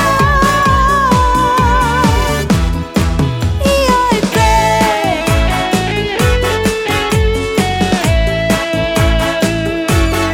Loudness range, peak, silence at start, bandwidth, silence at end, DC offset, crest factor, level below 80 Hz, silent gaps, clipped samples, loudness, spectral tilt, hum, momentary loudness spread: 2 LU; 0 dBFS; 0 s; 17.5 kHz; 0 s; under 0.1%; 12 dB; -20 dBFS; none; under 0.1%; -13 LUFS; -5 dB/octave; none; 4 LU